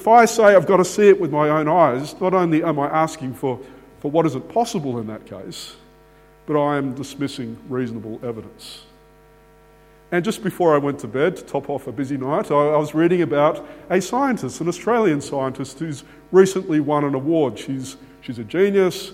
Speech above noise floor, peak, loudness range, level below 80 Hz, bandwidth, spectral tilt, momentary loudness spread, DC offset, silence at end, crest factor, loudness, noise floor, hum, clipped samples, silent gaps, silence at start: 31 dB; 0 dBFS; 8 LU; -56 dBFS; 15.5 kHz; -6 dB/octave; 18 LU; under 0.1%; 0 s; 20 dB; -19 LUFS; -50 dBFS; none; under 0.1%; none; 0 s